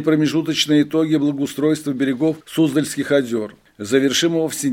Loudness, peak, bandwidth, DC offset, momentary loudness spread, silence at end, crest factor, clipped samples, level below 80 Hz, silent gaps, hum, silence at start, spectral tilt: -19 LUFS; -2 dBFS; 16.5 kHz; under 0.1%; 5 LU; 0 s; 16 dB; under 0.1%; -62 dBFS; none; none; 0 s; -4.5 dB/octave